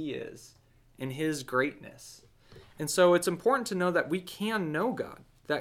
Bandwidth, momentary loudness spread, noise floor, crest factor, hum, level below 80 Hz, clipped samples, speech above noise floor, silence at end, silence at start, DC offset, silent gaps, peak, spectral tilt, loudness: 17 kHz; 22 LU; -55 dBFS; 18 dB; none; -66 dBFS; under 0.1%; 25 dB; 0 s; 0 s; under 0.1%; none; -12 dBFS; -4.5 dB/octave; -29 LUFS